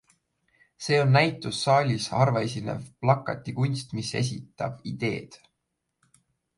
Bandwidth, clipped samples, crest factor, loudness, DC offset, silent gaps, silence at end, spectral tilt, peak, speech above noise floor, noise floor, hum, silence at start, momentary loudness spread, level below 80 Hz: 11.5 kHz; under 0.1%; 22 dB; -26 LUFS; under 0.1%; none; 1.25 s; -5.5 dB/octave; -6 dBFS; 55 dB; -81 dBFS; none; 0.8 s; 12 LU; -62 dBFS